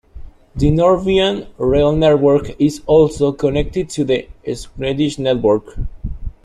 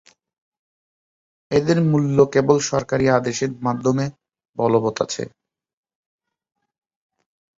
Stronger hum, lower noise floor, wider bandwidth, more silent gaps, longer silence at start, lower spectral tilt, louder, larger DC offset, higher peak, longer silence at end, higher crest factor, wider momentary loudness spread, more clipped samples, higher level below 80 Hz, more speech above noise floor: neither; second, -35 dBFS vs under -90 dBFS; first, 12 kHz vs 7.8 kHz; second, none vs 4.49-4.53 s; second, 0.15 s vs 1.5 s; about the same, -6.5 dB/octave vs -6 dB/octave; first, -16 LUFS vs -20 LUFS; neither; about the same, -2 dBFS vs -2 dBFS; second, 0.15 s vs 2.3 s; second, 14 dB vs 20 dB; first, 14 LU vs 9 LU; neither; first, -30 dBFS vs -54 dBFS; second, 19 dB vs over 71 dB